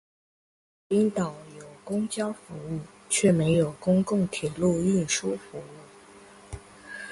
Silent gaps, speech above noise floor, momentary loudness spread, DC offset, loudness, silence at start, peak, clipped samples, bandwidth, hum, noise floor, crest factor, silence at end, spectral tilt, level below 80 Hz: none; 25 dB; 21 LU; under 0.1%; -26 LUFS; 0.9 s; -10 dBFS; under 0.1%; 11.5 kHz; none; -50 dBFS; 18 dB; 0 s; -5.5 dB/octave; -56 dBFS